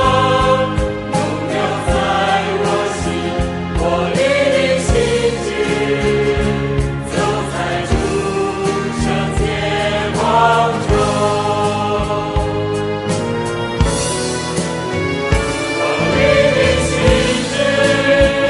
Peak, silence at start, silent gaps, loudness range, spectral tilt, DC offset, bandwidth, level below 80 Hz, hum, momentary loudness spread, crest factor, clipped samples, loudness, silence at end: 0 dBFS; 0 s; none; 3 LU; -5 dB/octave; under 0.1%; 11.5 kHz; -28 dBFS; none; 7 LU; 16 dB; under 0.1%; -16 LUFS; 0 s